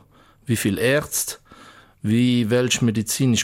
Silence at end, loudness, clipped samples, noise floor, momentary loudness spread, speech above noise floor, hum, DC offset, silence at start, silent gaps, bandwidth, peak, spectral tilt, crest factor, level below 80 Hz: 0 s; -21 LUFS; under 0.1%; -48 dBFS; 11 LU; 28 dB; none; under 0.1%; 0.5 s; none; 17 kHz; -8 dBFS; -4.5 dB/octave; 14 dB; -54 dBFS